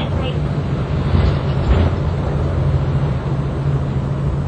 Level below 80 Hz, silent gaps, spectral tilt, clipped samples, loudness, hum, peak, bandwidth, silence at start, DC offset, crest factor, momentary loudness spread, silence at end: -24 dBFS; none; -8.5 dB/octave; under 0.1%; -19 LUFS; none; -2 dBFS; 8.4 kHz; 0 s; under 0.1%; 14 dB; 4 LU; 0 s